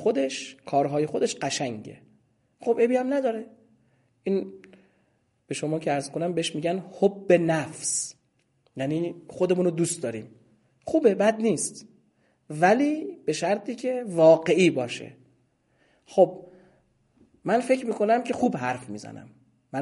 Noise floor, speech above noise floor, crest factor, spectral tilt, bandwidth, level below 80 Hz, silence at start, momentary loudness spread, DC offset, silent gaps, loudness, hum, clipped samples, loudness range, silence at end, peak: -69 dBFS; 45 dB; 20 dB; -5 dB/octave; 11.5 kHz; -72 dBFS; 0 s; 16 LU; under 0.1%; none; -25 LUFS; none; under 0.1%; 6 LU; 0 s; -6 dBFS